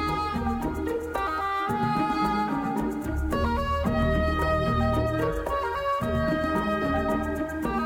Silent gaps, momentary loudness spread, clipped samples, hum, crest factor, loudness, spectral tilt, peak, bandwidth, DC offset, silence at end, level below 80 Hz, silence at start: none; 5 LU; under 0.1%; none; 12 dB; -27 LUFS; -7 dB/octave; -14 dBFS; 17 kHz; under 0.1%; 0 s; -36 dBFS; 0 s